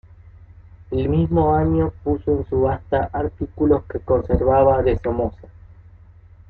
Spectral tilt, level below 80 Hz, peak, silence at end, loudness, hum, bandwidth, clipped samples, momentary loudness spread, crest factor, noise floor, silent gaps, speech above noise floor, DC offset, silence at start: -11.5 dB/octave; -34 dBFS; -4 dBFS; 1.05 s; -20 LUFS; none; 4.4 kHz; under 0.1%; 9 LU; 16 dB; -46 dBFS; none; 27 dB; under 0.1%; 0.25 s